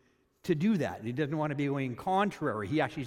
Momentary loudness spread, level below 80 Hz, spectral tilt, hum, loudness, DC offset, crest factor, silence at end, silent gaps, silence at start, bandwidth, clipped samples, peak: 5 LU; -66 dBFS; -7 dB/octave; none; -31 LUFS; under 0.1%; 16 dB; 0 s; none; 0.45 s; 15 kHz; under 0.1%; -14 dBFS